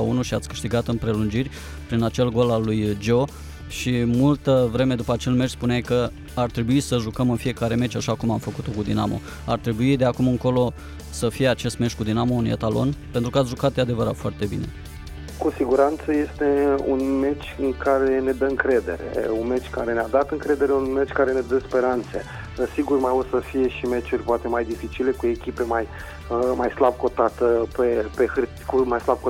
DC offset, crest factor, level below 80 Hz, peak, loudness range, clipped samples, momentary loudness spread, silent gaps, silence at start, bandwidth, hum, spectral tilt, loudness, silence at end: under 0.1%; 16 dB; -40 dBFS; -6 dBFS; 2 LU; under 0.1%; 8 LU; none; 0 s; 16.5 kHz; none; -6.5 dB/octave; -23 LUFS; 0 s